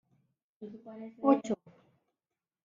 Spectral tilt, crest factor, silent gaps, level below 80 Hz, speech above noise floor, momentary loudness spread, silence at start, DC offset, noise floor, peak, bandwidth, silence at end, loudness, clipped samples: -6.5 dB/octave; 24 dB; none; -80 dBFS; over 58 dB; 21 LU; 0.6 s; under 0.1%; under -90 dBFS; -12 dBFS; 7.2 kHz; 1.1 s; -31 LUFS; under 0.1%